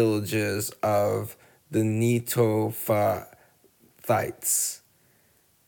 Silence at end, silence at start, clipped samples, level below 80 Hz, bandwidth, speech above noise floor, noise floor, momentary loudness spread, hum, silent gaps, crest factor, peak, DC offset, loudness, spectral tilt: 0.9 s; 0 s; under 0.1%; -66 dBFS; over 20 kHz; 39 dB; -64 dBFS; 8 LU; none; none; 18 dB; -10 dBFS; under 0.1%; -26 LUFS; -5 dB/octave